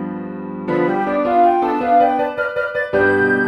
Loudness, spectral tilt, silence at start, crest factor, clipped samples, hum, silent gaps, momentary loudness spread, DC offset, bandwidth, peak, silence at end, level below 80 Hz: -17 LUFS; -8 dB/octave; 0 s; 14 dB; under 0.1%; none; none; 12 LU; under 0.1%; 9.4 kHz; -4 dBFS; 0 s; -52 dBFS